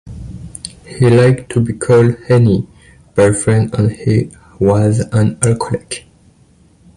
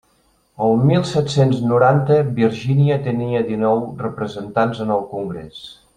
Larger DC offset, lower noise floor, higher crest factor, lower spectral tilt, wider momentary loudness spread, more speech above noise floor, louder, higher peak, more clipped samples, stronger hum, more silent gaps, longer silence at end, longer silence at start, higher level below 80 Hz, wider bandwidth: neither; second, -49 dBFS vs -60 dBFS; about the same, 14 dB vs 16 dB; about the same, -6.5 dB/octave vs -7.5 dB/octave; first, 18 LU vs 12 LU; second, 37 dB vs 42 dB; first, -13 LUFS vs -18 LUFS; about the same, 0 dBFS vs -2 dBFS; neither; neither; neither; first, 1 s vs 0.25 s; second, 0.05 s vs 0.6 s; first, -38 dBFS vs -52 dBFS; first, 11.5 kHz vs 9.6 kHz